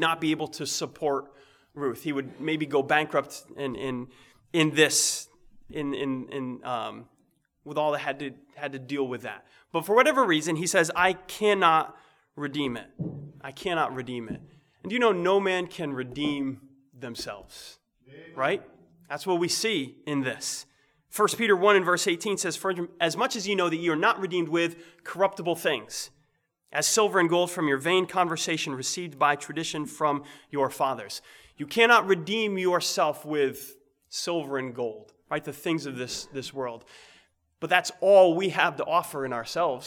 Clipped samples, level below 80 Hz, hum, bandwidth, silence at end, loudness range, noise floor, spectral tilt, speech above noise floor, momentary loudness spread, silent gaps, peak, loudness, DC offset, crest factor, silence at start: under 0.1%; -68 dBFS; none; 19.5 kHz; 0 s; 8 LU; -72 dBFS; -3.5 dB/octave; 45 dB; 16 LU; none; -4 dBFS; -26 LUFS; under 0.1%; 24 dB; 0 s